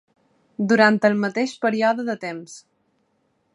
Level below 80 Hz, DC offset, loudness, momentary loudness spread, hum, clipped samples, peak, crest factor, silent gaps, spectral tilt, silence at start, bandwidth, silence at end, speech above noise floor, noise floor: -74 dBFS; under 0.1%; -20 LUFS; 19 LU; none; under 0.1%; -2 dBFS; 22 dB; none; -5.5 dB/octave; 0.6 s; 11 kHz; 0.95 s; 48 dB; -68 dBFS